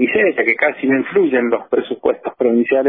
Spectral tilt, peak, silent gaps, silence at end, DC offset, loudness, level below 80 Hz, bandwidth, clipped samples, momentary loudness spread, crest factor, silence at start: -9.5 dB/octave; -2 dBFS; none; 0 s; under 0.1%; -16 LUFS; -60 dBFS; 3.9 kHz; under 0.1%; 5 LU; 14 dB; 0 s